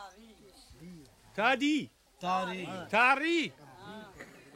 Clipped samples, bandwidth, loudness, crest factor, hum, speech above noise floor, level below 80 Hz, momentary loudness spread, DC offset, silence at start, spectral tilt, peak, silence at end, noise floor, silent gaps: under 0.1%; 15.5 kHz; -30 LUFS; 20 dB; none; 27 dB; -68 dBFS; 26 LU; under 0.1%; 0 s; -4 dB/octave; -14 dBFS; 0.2 s; -56 dBFS; none